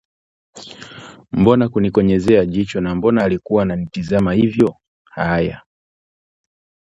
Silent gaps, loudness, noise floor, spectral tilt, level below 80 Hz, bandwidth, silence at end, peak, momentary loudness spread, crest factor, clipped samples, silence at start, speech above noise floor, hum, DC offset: 4.88-5.05 s; -17 LUFS; under -90 dBFS; -8 dB/octave; -42 dBFS; 8.4 kHz; 1.35 s; 0 dBFS; 21 LU; 18 dB; under 0.1%; 0.55 s; over 74 dB; none; under 0.1%